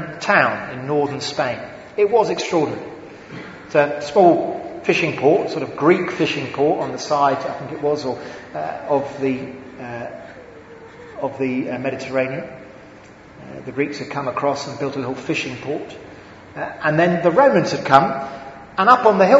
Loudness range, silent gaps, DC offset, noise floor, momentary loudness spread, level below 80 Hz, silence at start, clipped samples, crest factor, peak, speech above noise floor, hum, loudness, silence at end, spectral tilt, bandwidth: 9 LU; none; under 0.1%; -42 dBFS; 20 LU; -58 dBFS; 0 s; under 0.1%; 20 dB; 0 dBFS; 24 dB; none; -19 LUFS; 0 s; -5.5 dB/octave; 8 kHz